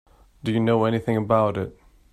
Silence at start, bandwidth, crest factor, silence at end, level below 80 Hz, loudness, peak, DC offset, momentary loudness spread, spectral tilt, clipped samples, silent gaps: 0.45 s; 13 kHz; 18 dB; 0.4 s; -52 dBFS; -23 LUFS; -4 dBFS; under 0.1%; 11 LU; -8.5 dB/octave; under 0.1%; none